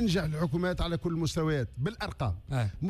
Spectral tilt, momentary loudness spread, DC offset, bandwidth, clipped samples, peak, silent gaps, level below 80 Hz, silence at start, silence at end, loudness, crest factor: -6.5 dB/octave; 5 LU; under 0.1%; 14 kHz; under 0.1%; -18 dBFS; none; -42 dBFS; 0 s; 0 s; -31 LUFS; 12 dB